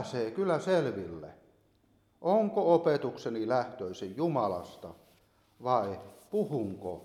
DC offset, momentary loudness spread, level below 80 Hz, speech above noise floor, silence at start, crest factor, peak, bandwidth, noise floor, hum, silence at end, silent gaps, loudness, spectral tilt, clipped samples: under 0.1%; 17 LU; -70 dBFS; 37 dB; 0 s; 20 dB; -12 dBFS; 14 kHz; -68 dBFS; none; 0 s; none; -31 LUFS; -7 dB/octave; under 0.1%